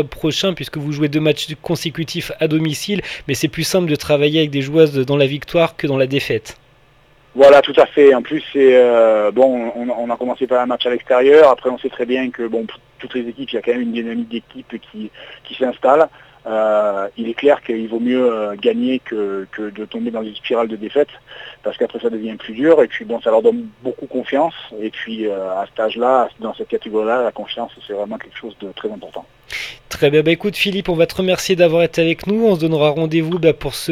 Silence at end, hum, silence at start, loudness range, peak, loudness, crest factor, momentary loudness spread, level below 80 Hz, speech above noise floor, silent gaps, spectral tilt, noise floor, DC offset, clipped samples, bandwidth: 0 s; none; 0 s; 9 LU; 0 dBFS; -16 LUFS; 16 dB; 16 LU; -50 dBFS; 34 dB; none; -5.5 dB/octave; -51 dBFS; under 0.1%; under 0.1%; 15.5 kHz